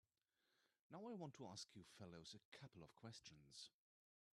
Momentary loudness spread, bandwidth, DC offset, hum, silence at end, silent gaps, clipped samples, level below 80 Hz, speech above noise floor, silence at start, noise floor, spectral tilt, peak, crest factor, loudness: 8 LU; 12.5 kHz; under 0.1%; none; 0.65 s; 0.81-0.90 s, 2.45-2.52 s; under 0.1%; -90 dBFS; over 30 dB; 0.6 s; under -90 dBFS; -4.5 dB/octave; -42 dBFS; 20 dB; -60 LUFS